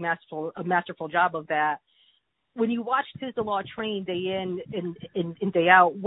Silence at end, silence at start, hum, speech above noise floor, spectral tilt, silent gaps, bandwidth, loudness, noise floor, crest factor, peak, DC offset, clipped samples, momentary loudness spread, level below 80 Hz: 0 s; 0 s; none; 42 dB; -9.5 dB/octave; none; 4 kHz; -26 LUFS; -68 dBFS; 22 dB; -4 dBFS; under 0.1%; under 0.1%; 11 LU; -68 dBFS